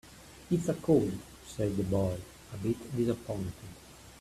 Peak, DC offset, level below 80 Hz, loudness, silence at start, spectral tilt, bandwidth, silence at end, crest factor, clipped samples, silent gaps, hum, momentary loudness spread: -14 dBFS; under 0.1%; -54 dBFS; -32 LUFS; 0.05 s; -7.5 dB/octave; 15 kHz; 0 s; 20 dB; under 0.1%; none; none; 22 LU